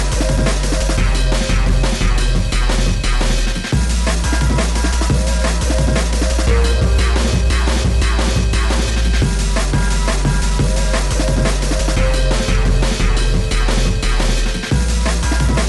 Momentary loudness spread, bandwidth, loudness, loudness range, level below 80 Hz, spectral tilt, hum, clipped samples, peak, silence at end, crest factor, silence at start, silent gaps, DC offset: 2 LU; 12 kHz; -17 LUFS; 1 LU; -16 dBFS; -4.5 dB/octave; none; under 0.1%; -2 dBFS; 0 s; 12 dB; 0 s; none; under 0.1%